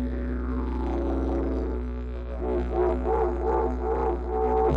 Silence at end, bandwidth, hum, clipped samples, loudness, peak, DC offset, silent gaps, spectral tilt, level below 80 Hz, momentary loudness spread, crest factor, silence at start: 0 s; 4.9 kHz; none; under 0.1%; -28 LUFS; -12 dBFS; under 0.1%; none; -10 dB/octave; -30 dBFS; 7 LU; 14 dB; 0 s